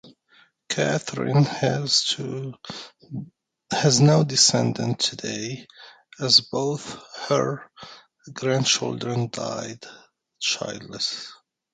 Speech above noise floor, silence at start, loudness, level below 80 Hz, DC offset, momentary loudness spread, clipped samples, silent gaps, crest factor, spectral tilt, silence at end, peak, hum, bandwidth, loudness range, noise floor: 35 dB; 0.05 s; -22 LUFS; -64 dBFS; under 0.1%; 20 LU; under 0.1%; none; 22 dB; -3.5 dB/octave; 0.4 s; -2 dBFS; none; 9.6 kHz; 6 LU; -59 dBFS